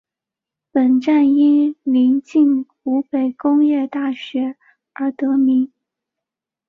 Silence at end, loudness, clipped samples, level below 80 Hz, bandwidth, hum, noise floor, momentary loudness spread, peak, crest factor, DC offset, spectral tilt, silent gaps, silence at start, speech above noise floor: 1.05 s; -17 LUFS; under 0.1%; -68 dBFS; 4.9 kHz; none; -86 dBFS; 10 LU; -6 dBFS; 12 dB; under 0.1%; -6.5 dB/octave; none; 0.75 s; 70 dB